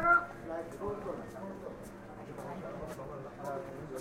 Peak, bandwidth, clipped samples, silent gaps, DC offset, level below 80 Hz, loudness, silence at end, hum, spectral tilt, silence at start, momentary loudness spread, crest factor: -16 dBFS; 16 kHz; under 0.1%; none; under 0.1%; -58 dBFS; -39 LUFS; 0 s; none; -6.5 dB/octave; 0 s; 9 LU; 20 dB